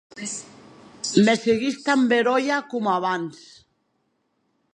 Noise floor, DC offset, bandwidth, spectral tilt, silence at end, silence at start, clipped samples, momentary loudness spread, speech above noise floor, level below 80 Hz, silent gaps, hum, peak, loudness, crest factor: -71 dBFS; under 0.1%; 10.5 kHz; -4.5 dB/octave; 1.4 s; 0.15 s; under 0.1%; 13 LU; 50 dB; -66 dBFS; none; none; -4 dBFS; -22 LUFS; 20 dB